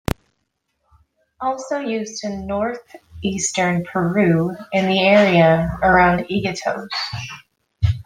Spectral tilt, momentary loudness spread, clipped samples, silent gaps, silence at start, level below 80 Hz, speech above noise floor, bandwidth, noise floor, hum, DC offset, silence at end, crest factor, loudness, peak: -5 dB/octave; 14 LU; under 0.1%; none; 0.1 s; -40 dBFS; 54 dB; 15.5 kHz; -72 dBFS; none; under 0.1%; 0.05 s; 18 dB; -19 LUFS; -2 dBFS